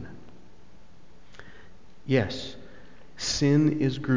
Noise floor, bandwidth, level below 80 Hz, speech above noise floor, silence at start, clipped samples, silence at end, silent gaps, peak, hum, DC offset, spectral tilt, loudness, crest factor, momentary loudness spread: -55 dBFS; 7.6 kHz; -52 dBFS; 31 dB; 0 s; under 0.1%; 0 s; none; -10 dBFS; none; 0.9%; -5.5 dB/octave; -26 LUFS; 18 dB; 26 LU